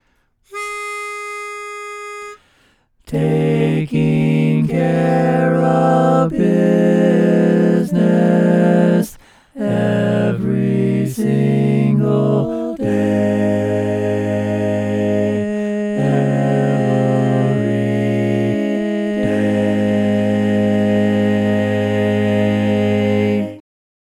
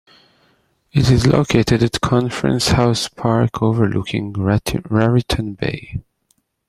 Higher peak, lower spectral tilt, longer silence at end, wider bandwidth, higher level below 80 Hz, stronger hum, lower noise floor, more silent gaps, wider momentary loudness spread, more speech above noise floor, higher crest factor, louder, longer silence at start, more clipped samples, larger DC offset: about the same, 0 dBFS vs -2 dBFS; first, -8 dB/octave vs -6 dB/octave; about the same, 0.6 s vs 0.65 s; about the same, 14.5 kHz vs 14.5 kHz; second, -52 dBFS vs -36 dBFS; neither; second, -60 dBFS vs -65 dBFS; neither; about the same, 11 LU vs 9 LU; about the same, 46 dB vs 48 dB; about the same, 16 dB vs 16 dB; about the same, -16 LUFS vs -17 LUFS; second, 0.5 s vs 0.95 s; neither; neither